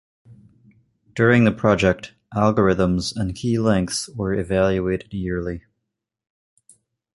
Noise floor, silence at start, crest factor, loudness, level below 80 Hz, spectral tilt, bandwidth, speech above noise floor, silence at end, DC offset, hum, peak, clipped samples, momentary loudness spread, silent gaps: -80 dBFS; 0.3 s; 20 dB; -20 LUFS; -42 dBFS; -6 dB/octave; 11.5 kHz; 61 dB; 1.55 s; under 0.1%; none; -2 dBFS; under 0.1%; 11 LU; none